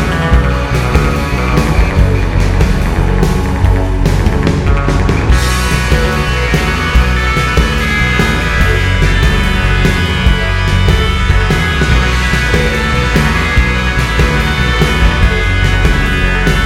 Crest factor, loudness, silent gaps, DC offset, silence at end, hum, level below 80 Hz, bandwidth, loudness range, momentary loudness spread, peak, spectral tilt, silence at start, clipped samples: 10 dB; -12 LUFS; none; under 0.1%; 0 s; none; -14 dBFS; 15.5 kHz; 1 LU; 2 LU; 0 dBFS; -5.5 dB/octave; 0 s; under 0.1%